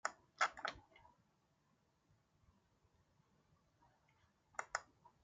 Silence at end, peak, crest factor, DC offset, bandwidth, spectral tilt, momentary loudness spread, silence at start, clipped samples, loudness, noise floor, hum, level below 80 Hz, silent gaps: 0.4 s; -22 dBFS; 30 dB; under 0.1%; 9 kHz; -0.5 dB/octave; 12 LU; 0.05 s; under 0.1%; -44 LUFS; -80 dBFS; none; -80 dBFS; none